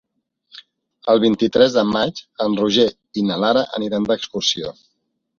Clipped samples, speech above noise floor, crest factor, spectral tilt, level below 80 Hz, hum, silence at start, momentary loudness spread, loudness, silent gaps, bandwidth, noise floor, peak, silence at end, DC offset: under 0.1%; 54 dB; 18 dB; -4.5 dB/octave; -56 dBFS; none; 0.55 s; 9 LU; -18 LUFS; none; 7.2 kHz; -72 dBFS; -2 dBFS; 0.65 s; under 0.1%